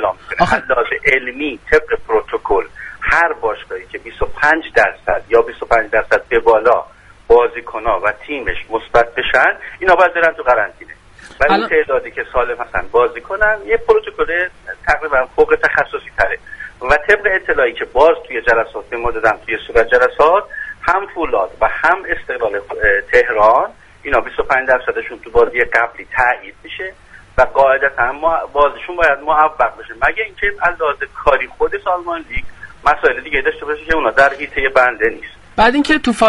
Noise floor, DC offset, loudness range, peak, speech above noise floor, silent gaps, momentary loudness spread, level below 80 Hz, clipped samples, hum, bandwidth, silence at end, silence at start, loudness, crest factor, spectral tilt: -39 dBFS; under 0.1%; 2 LU; 0 dBFS; 24 dB; none; 10 LU; -36 dBFS; under 0.1%; none; 11.5 kHz; 0 s; 0 s; -15 LUFS; 16 dB; -4.5 dB/octave